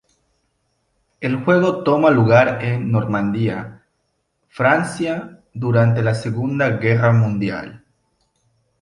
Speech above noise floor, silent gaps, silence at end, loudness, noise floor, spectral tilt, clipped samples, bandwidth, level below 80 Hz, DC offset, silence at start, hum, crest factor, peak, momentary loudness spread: 53 dB; none; 1.05 s; -18 LUFS; -70 dBFS; -8 dB/octave; under 0.1%; 11 kHz; -52 dBFS; under 0.1%; 1.2 s; none; 18 dB; -2 dBFS; 13 LU